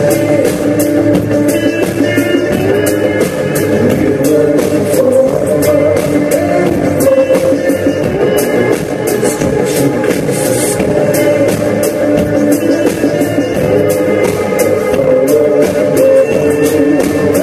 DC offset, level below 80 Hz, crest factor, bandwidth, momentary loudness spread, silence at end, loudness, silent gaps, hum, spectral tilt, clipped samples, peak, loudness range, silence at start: under 0.1%; -38 dBFS; 10 dB; 14 kHz; 3 LU; 0 s; -11 LUFS; none; none; -5.5 dB/octave; under 0.1%; 0 dBFS; 2 LU; 0 s